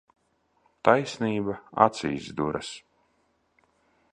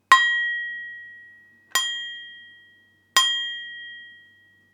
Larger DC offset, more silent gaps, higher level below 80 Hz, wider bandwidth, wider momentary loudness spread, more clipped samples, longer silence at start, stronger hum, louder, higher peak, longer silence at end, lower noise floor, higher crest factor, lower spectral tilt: neither; neither; first, -60 dBFS vs -86 dBFS; second, 10.5 kHz vs 19.5 kHz; second, 12 LU vs 23 LU; neither; first, 0.85 s vs 0.1 s; neither; second, -26 LUFS vs -22 LUFS; about the same, -2 dBFS vs 0 dBFS; first, 1.35 s vs 0.6 s; first, -70 dBFS vs -58 dBFS; about the same, 26 dB vs 26 dB; first, -5.5 dB/octave vs 3.5 dB/octave